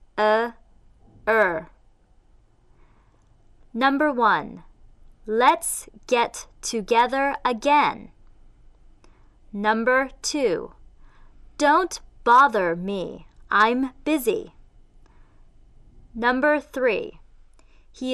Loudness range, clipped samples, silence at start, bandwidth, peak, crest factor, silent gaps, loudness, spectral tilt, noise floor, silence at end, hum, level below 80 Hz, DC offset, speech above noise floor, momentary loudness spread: 5 LU; under 0.1%; 0.15 s; 13 kHz; -6 dBFS; 18 dB; none; -22 LUFS; -3.5 dB/octave; -57 dBFS; 0 s; none; -50 dBFS; under 0.1%; 35 dB; 13 LU